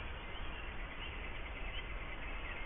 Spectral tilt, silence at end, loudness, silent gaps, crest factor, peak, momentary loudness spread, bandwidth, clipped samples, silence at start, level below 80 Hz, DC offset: -2 dB/octave; 0 s; -45 LUFS; none; 12 dB; -30 dBFS; 2 LU; 3.8 kHz; under 0.1%; 0 s; -46 dBFS; under 0.1%